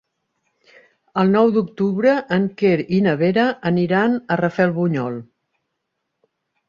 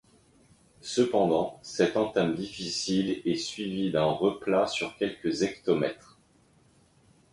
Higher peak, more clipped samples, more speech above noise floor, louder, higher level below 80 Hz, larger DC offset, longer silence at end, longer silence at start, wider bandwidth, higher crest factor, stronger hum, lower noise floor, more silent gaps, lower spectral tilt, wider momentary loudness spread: first, -4 dBFS vs -10 dBFS; neither; first, 59 dB vs 35 dB; first, -18 LUFS vs -28 LUFS; about the same, -60 dBFS vs -62 dBFS; neither; about the same, 1.45 s vs 1.4 s; first, 1.15 s vs 0.85 s; second, 7 kHz vs 11.5 kHz; about the same, 16 dB vs 18 dB; neither; first, -76 dBFS vs -63 dBFS; neither; first, -8.5 dB/octave vs -5 dB/octave; about the same, 5 LU vs 7 LU